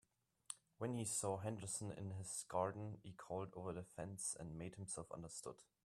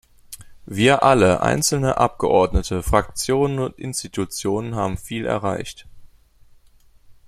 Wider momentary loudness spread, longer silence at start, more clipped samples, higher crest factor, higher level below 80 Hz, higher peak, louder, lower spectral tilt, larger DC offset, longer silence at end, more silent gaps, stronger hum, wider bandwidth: second, 11 LU vs 15 LU; first, 0.5 s vs 0.3 s; neither; about the same, 22 dB vs 20 dB; second, -76 dBFS vs -36 dBFS; second, -26 dBFS vs -2 dBFS; second, -47 LUFS vs -20 LUFS; about the same, -4.5 dB/octave vs -4.5 dB/octave; neither; about the same, 0.2 s vs 0.15 s; neither; neither; about the same, 14 kHz vs 15 kHz